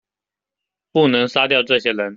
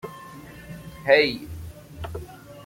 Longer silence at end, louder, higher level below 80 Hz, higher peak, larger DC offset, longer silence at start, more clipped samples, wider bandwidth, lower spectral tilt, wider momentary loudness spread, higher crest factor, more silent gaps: about the same, 0 s vs 0 s; first, -16 LUFS vs -21 LUFS; second, -64 dBFS vs -48 dBFS; about the same, -2 dBFS vs -2 dBFS; neither; first, 0.95 s vs 0.05 s; neither; second, 7.6 kHz vs 16.5 kHz; about the same, -5.5 dB/octave vs -5 dB/octave; second, 2 LU vs 23 LU; second, 16 dB vs 24 dB; neither